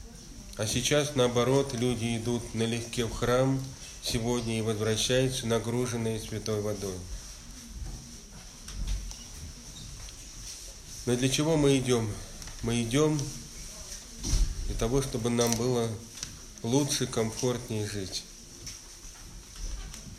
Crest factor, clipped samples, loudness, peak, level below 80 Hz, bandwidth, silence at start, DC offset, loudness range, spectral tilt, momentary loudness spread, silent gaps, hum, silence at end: 22 dB; under 0.1%; -30 LUFS; -8 dBFS; -42 dBFS; 16 kHz; 0 s; under 0.1%; 9 LU; -4.5 dB/octave; 17 LU; none; none; 0 s